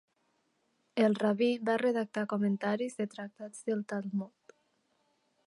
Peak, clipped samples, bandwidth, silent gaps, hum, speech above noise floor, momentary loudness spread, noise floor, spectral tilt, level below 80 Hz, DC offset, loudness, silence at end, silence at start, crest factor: -16 dBFS; under 0.1%; 11.5 kHz; none; none; 44 dB; 11 LU; -76 dBFS; -6.5 dB/octave; -84 dBFS; under 0.1%; -32 LUFS; 1.2 s; 0.95 s; 18 dB